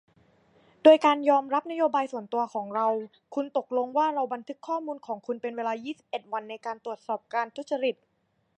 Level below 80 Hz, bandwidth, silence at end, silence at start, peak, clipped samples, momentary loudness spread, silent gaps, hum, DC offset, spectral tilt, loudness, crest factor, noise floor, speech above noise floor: -84 dBFS; 8.6 kHz; 0.65 s; 0.85 s; -6 dBFS; under 0.1%; 15 LU; none; none; under 0.1%; -5 dB/octave; -27 LUFS; 22 dB; -62 dBFS; 35 dB